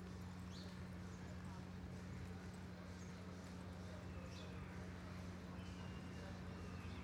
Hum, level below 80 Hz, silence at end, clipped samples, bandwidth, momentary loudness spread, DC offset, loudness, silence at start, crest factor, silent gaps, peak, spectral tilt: none; -62 dBFS; 0 s; under 0.1%; 16 kHz; 2 LU; under 0.1%; -53 LUFS; 0 s; 12 dB; none; -40 dBFS; -6 dB/octave